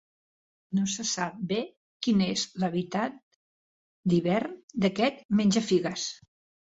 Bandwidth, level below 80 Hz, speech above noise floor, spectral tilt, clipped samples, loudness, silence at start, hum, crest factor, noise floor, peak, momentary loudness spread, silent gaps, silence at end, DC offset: 8 kHz; -66 dBFS; over 63 dB; -5 dB/octave; under 0.1%; -28 LUFS; 0.7 s; none; 18 dB; under -90 dBFS; -12 dBFS; 9 LU; 1.77-2.00 s, 3.23-4.03 s, 4.63-4.68 s, 5.25-5.29 s; 0.55 s; under 0.1%